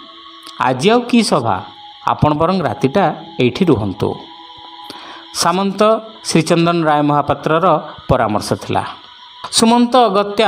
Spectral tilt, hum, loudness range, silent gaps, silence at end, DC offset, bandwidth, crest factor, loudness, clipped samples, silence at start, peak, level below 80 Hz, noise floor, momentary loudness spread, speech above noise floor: -5 dB/octave; none; 3 LU; none; 0 s; under 0.1%; 16 kHz; 16 dB; -15 LUFS; under 0.1%; 0 s; 0 dBFS; -44 dBFS; -36 dBFS; 20 LU; 22 dB